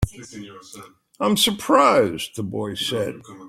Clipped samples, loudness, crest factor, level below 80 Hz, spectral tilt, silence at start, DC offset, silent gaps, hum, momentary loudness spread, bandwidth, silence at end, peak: under 0.1%; -20 LUFS; 20 dB; -44 dBFS; -4 dB/octave; 0 s; under 0.1%; none; none; 23 LU; 16.5 kHz; 0 s; -2 dBFS